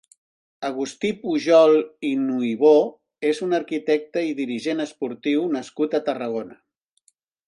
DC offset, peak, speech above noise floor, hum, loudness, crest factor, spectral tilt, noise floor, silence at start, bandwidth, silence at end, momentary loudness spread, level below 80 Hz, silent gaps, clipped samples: under 0.1%; -4 dBFS; 44 dB; none; -22 LUFS; 18 dB; -5.5 dB/octave; -65 dBFS; 0.6 s; 10.5 kHz; 0.95 s; 12 LU; -72 dBFS; none; under 0.1%